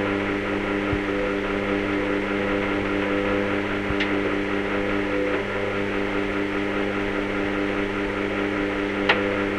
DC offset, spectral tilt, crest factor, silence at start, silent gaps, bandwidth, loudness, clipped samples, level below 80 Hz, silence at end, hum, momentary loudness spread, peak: under 0.1%; -6 dB/octave; 20 dB; 0 s; none; 10.5 kHz; -24 LUFS; under 0.1%; -42 dBFS; 0 s; none; 2 LU; -4 dBFS